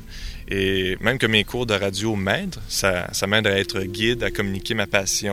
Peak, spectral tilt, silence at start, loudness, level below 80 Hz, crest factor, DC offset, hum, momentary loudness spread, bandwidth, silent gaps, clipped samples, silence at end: -2 dBFS; -3.5 dB/octave; 0 s; -22 LUFS; -40 dBFS; 20 dB; 0.2%; none; 7 LU; 16.5 kHz; none; under 0.1%; 0 s